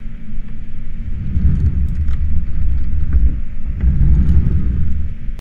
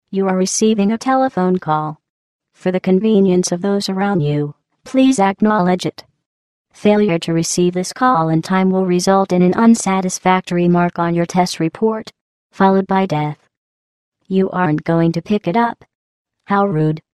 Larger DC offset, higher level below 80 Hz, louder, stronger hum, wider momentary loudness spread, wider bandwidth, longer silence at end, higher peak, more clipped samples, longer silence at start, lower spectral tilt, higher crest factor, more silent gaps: first, 2% vs under 0.1%; first, -16 dBFS vs -58 dBFS; second, -19 LUFS vs -16 LUFS; neither; first, 17 LU vs 7 LU; second, 2.6 kHz vs 12.5 kHz; second, 0 s vs 0.2 s; about the same, 0 dBFS vs 0 dBFS; neither; about the same, 0 s vs 0.1 s; first, -10.5 dB/octave vs -6 dB/octave; about the same, 12 dB vs 16 dB; second, none vs 2.09-2.39 s, 6.26-6.65 s, 12.21-12.50 s, 13.57-14.12 s, 15.95-16.25 s